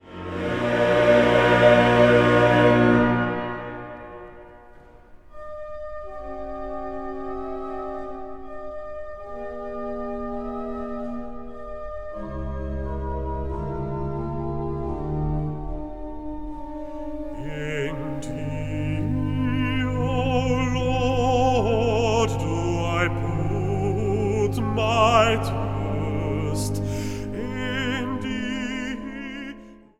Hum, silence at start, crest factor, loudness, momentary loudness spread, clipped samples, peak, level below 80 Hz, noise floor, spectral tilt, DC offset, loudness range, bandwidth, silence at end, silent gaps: none; 0.05 s; 20 dB; -23 LUFS; 19 LU; under 0.1%; -4 dBFS; -38 dBFS; -47 dBFS; -6.5 dB/octave; under 0.1%; 15 LU; 13.5 kHz; 0.25 s; none